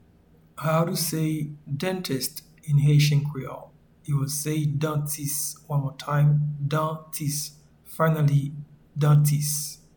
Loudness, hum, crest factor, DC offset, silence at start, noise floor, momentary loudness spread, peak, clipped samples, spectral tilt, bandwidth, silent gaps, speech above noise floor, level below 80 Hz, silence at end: -25 LUFS; none; 16 dB; under 0.1%; 0.55 s; -57 dBFS; 15 LU; -8 dBFS; under 0.1%; -5.5 dB/octave; 19.5 kHz; none; 33 dB; -56 dBFS; 0.2 s